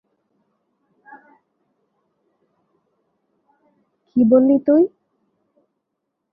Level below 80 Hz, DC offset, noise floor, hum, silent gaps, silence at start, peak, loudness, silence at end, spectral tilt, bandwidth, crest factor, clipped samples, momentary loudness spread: -66 dBFS; under 0.1%; -78 dBFS; none; none; 4.15 s; -2 dBFS; -16 LUFS; 1.45 s; -13 dB/octave; 2.9 kHz; 20 dB; under 0.1%; 8 LU